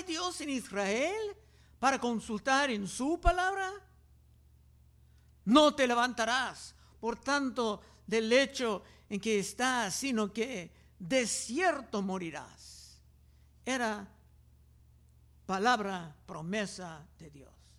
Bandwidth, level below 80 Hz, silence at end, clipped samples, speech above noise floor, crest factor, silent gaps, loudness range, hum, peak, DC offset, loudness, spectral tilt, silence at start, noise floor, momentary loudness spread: 15 kHz; -52 dBFS; 0.35 s; under 0.1%; 30 dB; 24 dB; none; 6 LU; none; -10 dBFS; under 0.1%; -32 LUFS; -3.5 dB/octave; 0 s; -61 dBFS; 17 LU